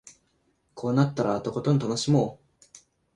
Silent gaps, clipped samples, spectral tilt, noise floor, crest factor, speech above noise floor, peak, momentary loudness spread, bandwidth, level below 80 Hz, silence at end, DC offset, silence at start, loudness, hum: none; under 0.1%; -6.5 dB/octave; -70 dBFS; 20 dB; 45 dB; -8 dBFS; 5 LU; 11 kHz; -62 dBFS; 0.8 s; under 0.1%; 0.05 s; -26 LUFS; none